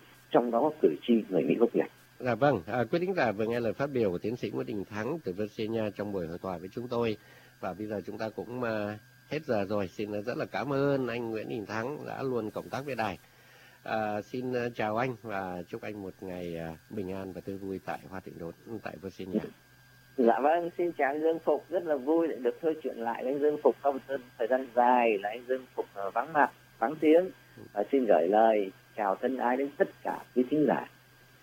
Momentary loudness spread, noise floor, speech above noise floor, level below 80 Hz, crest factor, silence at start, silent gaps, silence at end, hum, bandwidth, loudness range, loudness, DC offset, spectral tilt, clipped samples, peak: 13 LU; -58 dBFS; 28 dB; -68 dBFS; 22 dB; 0.3 s; none; 0.55 s; none; 16 kHz; 8 LU; -31 LUFS; under 0.1%; -7 dB/octave; under 0.1%; -10 dBFS